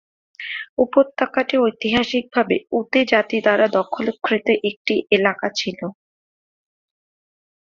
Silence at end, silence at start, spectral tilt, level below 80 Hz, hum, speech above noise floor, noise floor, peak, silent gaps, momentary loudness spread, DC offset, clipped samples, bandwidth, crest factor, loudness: 1.8 s; 0.4 s; -4.5 dB/octave; -58 dBFS; none; over 71 dB; under -90 dBFS; -2 dBFS; 0.69-0.77 s, 4.76-4.85 s; 10 LU; under 0.1%; under 0.1%; 7.4 kHz; 18 dB; -19 LUFS